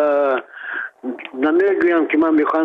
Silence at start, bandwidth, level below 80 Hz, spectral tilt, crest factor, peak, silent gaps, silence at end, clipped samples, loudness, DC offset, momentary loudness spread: 0 s; 4.9 kHz; -64 dBFS; -6.5 dB/octave; 10 dB; -8 dBFS; none; 0 s; under 0.1%; -18 LUFS; under 0.1%; 13 LU